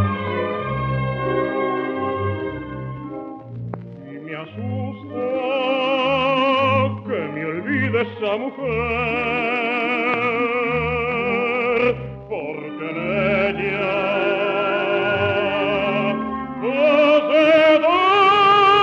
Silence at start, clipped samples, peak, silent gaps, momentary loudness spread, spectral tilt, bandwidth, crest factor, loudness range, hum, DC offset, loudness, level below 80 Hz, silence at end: 0 s; under 0.1%; -4 dBFS; none; 15 LU; -7 dB/octave; 7.6 kHz; 16 dB; 9 LU; none; under 0.1%; -19 LUFS; -48 dBFS; 0 s